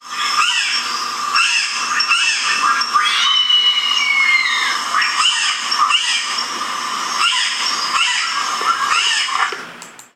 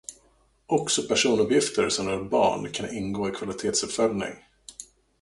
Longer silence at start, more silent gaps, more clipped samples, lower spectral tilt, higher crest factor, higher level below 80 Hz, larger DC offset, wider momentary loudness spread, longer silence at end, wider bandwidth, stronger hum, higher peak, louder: about the same, 0.05 s vs 0.1 s; neither; neither; second, 2.5 dB/octave vs -3 dB/octave; about the same, 14 dB vs 18 dB; second, -70 dBFS vs -58 dBFS; neither; second, 8 LU vs 20 LU; second, 0.1 s vs 0.35 s; first, 16 kHz vs 11.5 kHz; first, 60 Hz at -55 dBFS vs none; first, -4 dBFS vs -8 dBFS; first, -14 LUFS vs -25 LUFS